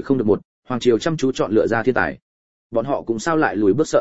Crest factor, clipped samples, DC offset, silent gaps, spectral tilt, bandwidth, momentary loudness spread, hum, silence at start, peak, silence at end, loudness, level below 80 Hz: 16 dB; under 0.1%; 0.8%; 0.45-0.62 s, 2.22-2.70 s; -6 dB/octave; 8 kHz; 7 LU; none; 0 s; -2 dBFS; 0 s; -20 LUFS; -50 dBFS